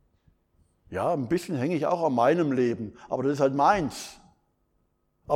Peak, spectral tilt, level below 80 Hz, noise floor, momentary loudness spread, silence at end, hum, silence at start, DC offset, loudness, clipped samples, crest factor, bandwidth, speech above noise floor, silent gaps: -8 dBFS; -6.5 dB/octave; -60 dBFS; -72 dBFS; 12 LU; 0 s; none; 0.9 s; under 0.1%; -26 LUFS; under 0.1%; 20 dB; 16 kHz; 46 dB; none